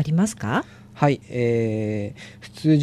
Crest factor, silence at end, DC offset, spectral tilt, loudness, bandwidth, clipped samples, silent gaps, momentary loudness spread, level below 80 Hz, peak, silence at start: 18 dB; 0 s; under 0.1%; -7 dB/octave; -23 LUFS; 13 kHz; under 0.1%; none; 16 LU; -56 dBFS; -4 dBFS; 0 s